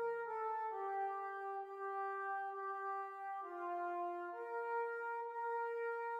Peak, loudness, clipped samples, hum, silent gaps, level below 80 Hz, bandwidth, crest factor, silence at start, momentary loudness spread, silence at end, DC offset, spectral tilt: -32 dBFS; -43 LUFS; under 0.1%; none; none; under -90 dBFS; 8.4 kHz; 10 dB; 0 s; 4 LU; 0 s; under 0.1%; -4.5 dB/octave